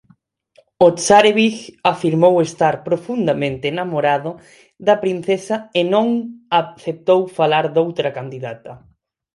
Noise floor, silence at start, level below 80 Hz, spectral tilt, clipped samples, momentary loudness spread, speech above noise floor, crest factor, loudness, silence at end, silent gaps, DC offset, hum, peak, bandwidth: -56 dBFS; 0.8 s; -58 dBFS; -5 dB/octave; under 0.1%; 10 LU; 39 dB; 18 dB; -17 LUFS; 0.6 s; none; under 0.1%; none; 0 dBFS; 11.5 kHz